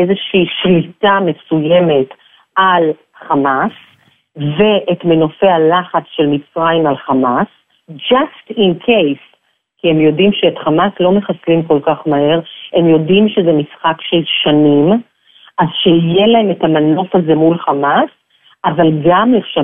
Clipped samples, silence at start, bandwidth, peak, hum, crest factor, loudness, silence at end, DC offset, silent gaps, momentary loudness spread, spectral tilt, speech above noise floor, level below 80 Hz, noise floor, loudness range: under 0.1%; 0 s; 3.8 kHz; 0 dBFS; none; 12 dB; -12 LUFS; 0 s; under 0.1%; none; 7 LU; -10 dB/octave; 46 dB; -52 dBFS; -58 dBFS; 3 LU